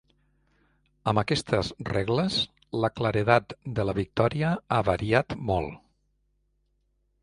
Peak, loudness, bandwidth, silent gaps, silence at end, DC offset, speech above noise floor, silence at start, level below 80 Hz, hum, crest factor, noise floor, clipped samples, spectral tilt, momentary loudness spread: -6 dBFS; -27 LUFS; 11.5 kHz; none; 1.45 s; under 0.1%; 46 dB; 1.05 s; -48 dBFS; 50 Hz at -50 dBFS; 22 dB; -72 dBFS; under 0.1%; -6 dB/octave; 6 LU